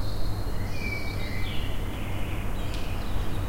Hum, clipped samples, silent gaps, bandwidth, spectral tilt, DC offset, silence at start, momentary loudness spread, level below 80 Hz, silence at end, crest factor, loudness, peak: none; under 0.1%; none; 16 kHz; -5.5 dB/octave; under 0.1%; 0 s; 2 LU; -32 dBFS; 0 s; 12 dB; -33 LUFS; -14 dBFS